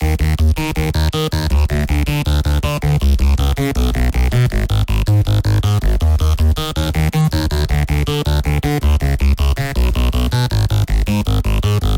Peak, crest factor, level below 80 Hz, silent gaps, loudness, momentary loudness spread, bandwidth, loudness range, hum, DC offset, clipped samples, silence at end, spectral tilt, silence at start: -2 dBFS; 12 dB; -18 dBFS; none; -16 LUFS; 2 LU; 17 kHz; 1 LU; none; under 0.1%; under 0.1%; 0 s; -6 dB/octave; 0 s